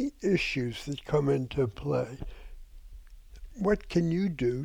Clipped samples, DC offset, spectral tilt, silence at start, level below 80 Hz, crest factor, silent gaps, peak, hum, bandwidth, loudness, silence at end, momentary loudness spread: under 0.1%; under 0.1%; -7 dB/octave; 0 s; -46 dBFS; 16 dB; none; -14 dBFS; none; 15.5 kHz; -30 LUFS; 0 s; 11 LU